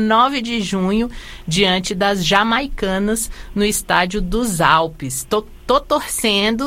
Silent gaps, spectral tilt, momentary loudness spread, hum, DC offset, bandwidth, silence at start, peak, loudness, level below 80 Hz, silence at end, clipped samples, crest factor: none; -3.5 dB/octave; 8 LU; none; under 0.1%; 16.5 kHz; 0 s; 0 dBFS; -17 LUFS; -34 dBFS; 0 s; under 0.1%; 18 dB